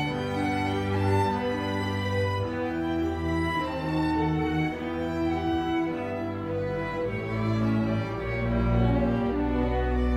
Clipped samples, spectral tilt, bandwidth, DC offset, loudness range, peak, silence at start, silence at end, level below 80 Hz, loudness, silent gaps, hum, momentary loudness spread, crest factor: under 0.1%; -7.5 dB/octave; 15 kHz; under 0.1%; 2 LU; -12 dBFS; 0 s; 0 s; -38 dBFS; -28 LUFS; none; none; 5 LU; 14 dB